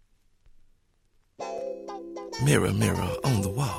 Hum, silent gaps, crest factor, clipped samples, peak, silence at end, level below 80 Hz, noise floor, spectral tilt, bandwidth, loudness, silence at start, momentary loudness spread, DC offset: none; none; 22 dB; under 0.1%; -6 dBFS; 0 s; -52 dBFS; -66 dBFS; -5.5 dB/octave; 16 kHz; -27 LUFS; 1.4 s; 16 LU; under 0.1%